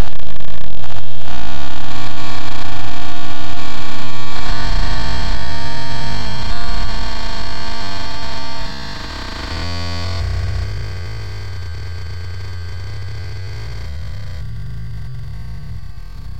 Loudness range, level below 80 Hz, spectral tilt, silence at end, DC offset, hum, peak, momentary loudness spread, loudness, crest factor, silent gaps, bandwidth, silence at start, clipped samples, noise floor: 5 LU; -28 dBFS; -5 dB/octave; 0 s; under 0.1%; none; 0 dBFS; 8 LU; -26 LUFS; 4 dB; none; 15.5 kHz; 0 s; 4%; -31 dBFS